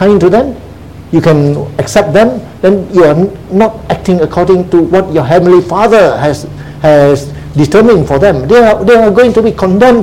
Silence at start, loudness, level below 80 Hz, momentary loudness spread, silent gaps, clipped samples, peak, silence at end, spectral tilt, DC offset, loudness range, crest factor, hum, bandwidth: 0 s; -8 LUFS; -32 dBFS; 7 LU; none; 2%; 0 dBFS; 0 s; -7 dB/octave; 0.9%; 2 LU; 8 dB; none; 15.5 kHz